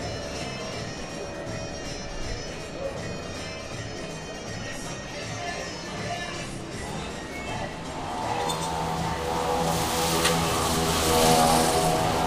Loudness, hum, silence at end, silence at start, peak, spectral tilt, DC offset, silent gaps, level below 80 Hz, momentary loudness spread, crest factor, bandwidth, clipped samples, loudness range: -27 LUFS; none; 0 s; 0 s; -6 dBFS; -3.5 dB/octave; under 0.1%; none; -42 dBFS; 13 LU; 22 dB; 16 kHz; under 0.1%; 11 LU